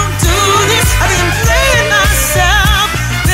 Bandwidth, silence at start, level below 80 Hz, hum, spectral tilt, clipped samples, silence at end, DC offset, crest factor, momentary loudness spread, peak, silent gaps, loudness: 16.5 kHz; 0 s; -18 dBFS; none; -3 dB/octave; under 0.1%; 0 s; under 0.1%; 10 dB; 3 LU; 0 dBFS; none; -10 LUFS